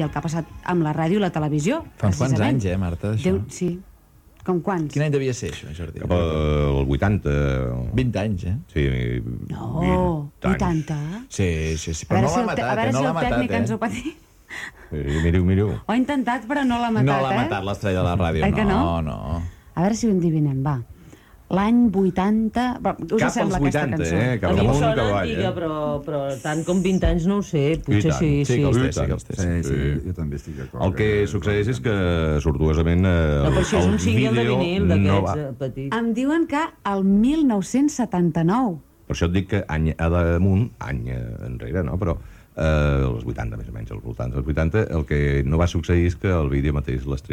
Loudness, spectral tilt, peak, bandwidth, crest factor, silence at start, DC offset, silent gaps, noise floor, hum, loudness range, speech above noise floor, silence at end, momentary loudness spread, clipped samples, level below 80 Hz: -22 LUFS; -7 dB/octave; -6 dBFS; 14.5 kHz; 14 dB; 0 s; under 0.1%; none; -51 dBFS; none; 4 LU; 30 dB; 0 s; 10 LU; under 0.1%; -32 dBFS